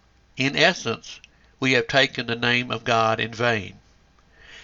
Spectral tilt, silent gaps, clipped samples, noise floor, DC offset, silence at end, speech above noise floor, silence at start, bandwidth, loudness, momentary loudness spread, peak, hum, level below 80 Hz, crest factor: -4 dB/octave; none; under 0.1%; -57 dBFS; under 0.1%; 0 s; 34 dB; 0.35 s; 7.8 kHz; -22 LUFS; 13 LU; -2 dBFS; none; -58 dBFS; 22 dB